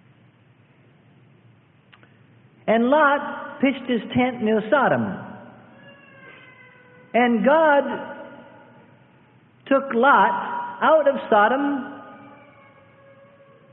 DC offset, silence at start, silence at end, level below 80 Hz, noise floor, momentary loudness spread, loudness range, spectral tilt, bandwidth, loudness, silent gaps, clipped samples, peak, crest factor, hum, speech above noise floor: under 0.1%; 2.65 s; 1.45 s; -66 dBFS; -55 dBFS; 18 LU; 5 LU; -10 dB/octave; 4 kHz; -20 LUFS; none; under 0.1%; -4 dBFS; 18 dB; none; 37 dB